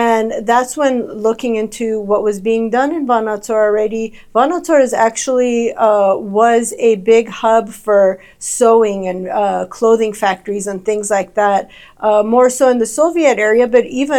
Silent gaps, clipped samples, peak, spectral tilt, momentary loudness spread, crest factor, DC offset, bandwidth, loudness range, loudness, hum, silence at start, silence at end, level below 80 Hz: none; under 0.1%; 0 dBFS; -4 dB/octave; 7 LU; 14 dB; under 0.1%; 14 kHz; 3 LU; -14 LUFS; none; 0 s; 0 s; -50 dBFS